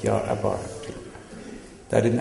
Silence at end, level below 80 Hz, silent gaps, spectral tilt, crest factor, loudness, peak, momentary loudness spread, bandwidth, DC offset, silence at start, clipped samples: 0 s; -50 dBFS; none; -6.5 dB/octave; 20 dB; -27 LUFS; -6 dBFS; 18 LU; 11.5 kHz; under 0.1%; 0 s; under 0.1%